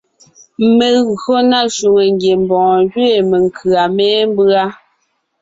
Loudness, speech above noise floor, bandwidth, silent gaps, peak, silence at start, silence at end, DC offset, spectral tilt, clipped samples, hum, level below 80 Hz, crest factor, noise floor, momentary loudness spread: -12 LUFS; 52 dB; 7.8 kHz; none; -2 dBFS; 0.6 s; 0.65 s; under 0.1%; -5 dB/octave; under 0.1%; none; -54 dBFS; 10 dB; -64 dBFS; 3 LU